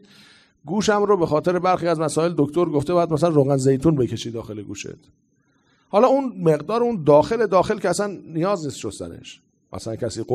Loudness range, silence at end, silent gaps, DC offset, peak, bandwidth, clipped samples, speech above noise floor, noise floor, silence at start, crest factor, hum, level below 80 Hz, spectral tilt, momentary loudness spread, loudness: 3 LU; 0 s; none; under 0.1%; -2 dBFS; 13.5 kHz; under 0.1%; 42 dB; -62 dBFS; 0.65 s; 18 dB; none; -52 dBFS; -6.5 dB/octave; 15 LU; -20 LUFS